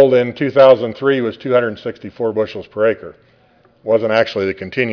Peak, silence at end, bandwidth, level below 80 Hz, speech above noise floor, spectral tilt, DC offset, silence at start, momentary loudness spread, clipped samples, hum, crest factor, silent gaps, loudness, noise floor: 0 dBFS; 0 s; 5.4 kHz; -58 dBFS; 37 dB; -7 dB/octave; under 0.1%; 0 s; 13 LU; under 0.1%; none; 16 dB; none; -16 LUFS; -53 dBFS